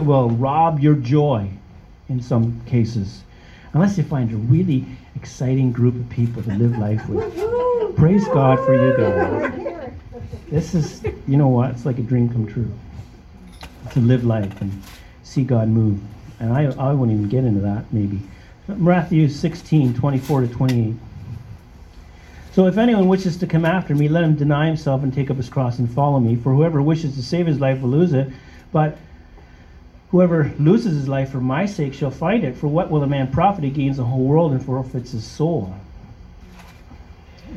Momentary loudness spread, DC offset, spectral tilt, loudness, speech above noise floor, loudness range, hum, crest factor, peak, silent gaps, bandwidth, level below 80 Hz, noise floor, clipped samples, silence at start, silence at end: 13 LU; under 0.1%; -8.5 dB/octave; -19 LUFS; 26 dB; 4 LU; none; 18 dB; -2 dBFS; none; 8 kHz; -42 dBFS; -44 dBFS; under 0.1%; 0 s; 0 s